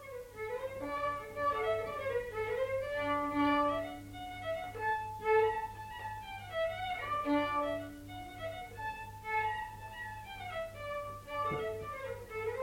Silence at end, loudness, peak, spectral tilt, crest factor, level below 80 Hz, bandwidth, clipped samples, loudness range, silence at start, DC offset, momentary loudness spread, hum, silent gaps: 0 s; -37 LUFS; -20 dBFS; -5.5 dB/octave; 16 dB; -58 dBFS; 16.5 kHz; under 0.1%; 6 LU; 0 s; under 0.1%; 12 LU; 50 Hz at -60 dBFS; none